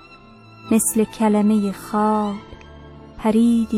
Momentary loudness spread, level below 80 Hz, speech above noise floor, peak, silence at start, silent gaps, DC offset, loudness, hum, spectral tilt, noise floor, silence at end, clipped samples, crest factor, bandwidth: 8 LU; -48 dBFS; 27 dB; -6 dBFS; 0.65 s; none; under 0.1%; -19 LUFS; none; -5.5 dB/octave; -45 dBFS; 0 s; under 0.1%; 14 dB; 16 kHz